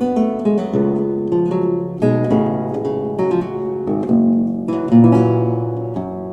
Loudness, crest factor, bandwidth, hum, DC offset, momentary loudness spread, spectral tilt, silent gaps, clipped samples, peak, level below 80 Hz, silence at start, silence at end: -17 LUFS; 14 dB; 7.6 kHz; none; under 0.1%; 9 LU; -10 dB/octave; none; under 0.1%; -2 dBFS; -50 dBFS; 0 s; 0 s